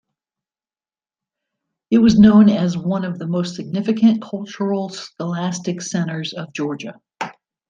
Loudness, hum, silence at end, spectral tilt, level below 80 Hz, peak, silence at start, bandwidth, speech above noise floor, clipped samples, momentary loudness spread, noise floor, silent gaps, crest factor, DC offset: -18 LUFS; none; 0.4 s; -6.5 dB/octave; -52 dBFS; 0 dBFS; 1.9 s; 7.6 kHz; over 73 dB; under 0.1%; 19 LU; under -90 dBFS; none; 18 dB; under 0.1%